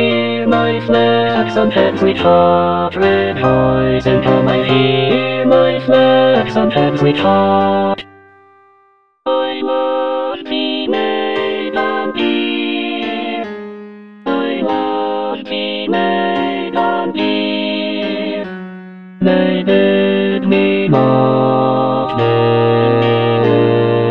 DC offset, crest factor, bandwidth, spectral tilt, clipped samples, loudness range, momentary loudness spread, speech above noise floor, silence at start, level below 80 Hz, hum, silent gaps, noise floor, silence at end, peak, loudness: 0.7%; 14 dB; 6.8 kHz; -8 dB/octave; under 0.1%; 6 LU; 8 LU; 41 dB; 0 s; -44 dBFS; none; none; -53 dBFS; 0 s; 0 dBFS; -14 LUFS